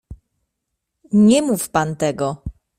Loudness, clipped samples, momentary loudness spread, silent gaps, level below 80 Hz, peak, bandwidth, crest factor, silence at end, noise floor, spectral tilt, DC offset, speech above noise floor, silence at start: -18 LUFS; under 0.1%; 11 LU; none; -44 dBFS; -2 dBFS; 15.5 kHz; 16 dB; 0.3 s; -78 dBFS; -5.5 dB/octave; under 0.1%; 61 dB; 0.1 s